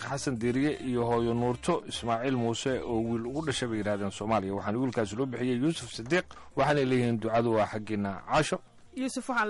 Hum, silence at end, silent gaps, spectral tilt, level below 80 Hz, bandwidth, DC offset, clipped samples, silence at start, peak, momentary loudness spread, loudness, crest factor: none; 0 s; none; -5.5 dB/octave; -56 dBFS; 11.5 kHz; under 0.1%; under 0.1%; 0 s; -16 dBFS; 6 LU; -30 LUFS; 12 dB